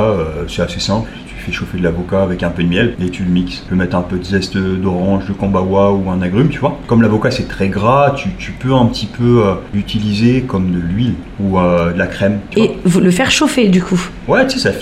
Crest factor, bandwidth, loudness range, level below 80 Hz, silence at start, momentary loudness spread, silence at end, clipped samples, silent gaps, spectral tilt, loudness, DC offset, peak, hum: 14 dB; 13.5 kHz; 3 LU; -34 dBFS; 0 s; 8 LU; 0 s; under 0.1%; none; -6 dB/octave; -14 LUFS; under 0.1%; 0 dBFS; none